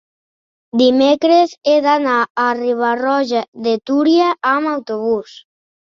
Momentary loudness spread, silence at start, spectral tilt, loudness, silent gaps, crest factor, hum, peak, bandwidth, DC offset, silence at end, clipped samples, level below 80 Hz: 8 LU; 0.75 s; -4.5 dB/octave; -15 LUFS; 2.30-2.35 s, 3.48-3.52 s; 14 dB; none; -2 dBFS; 7.4 kHz; under 0.1%; 0.75 s; under 0.1%; -64 dBFS